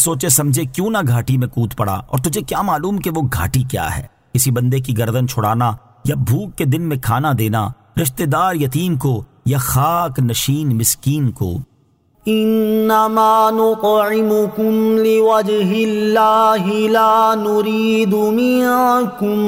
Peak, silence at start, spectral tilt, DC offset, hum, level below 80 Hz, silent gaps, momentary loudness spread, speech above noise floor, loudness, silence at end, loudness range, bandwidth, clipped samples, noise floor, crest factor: -2 dBFS; 0 s; -5.5 dB/octave; under 0.1%; none; -42 dBFS; none; 7 LU; 41 dB; -16 LUFS; 0 s; 4 LU; 16.5 kHz; under 0.1%; -56 dBFS; 14 dB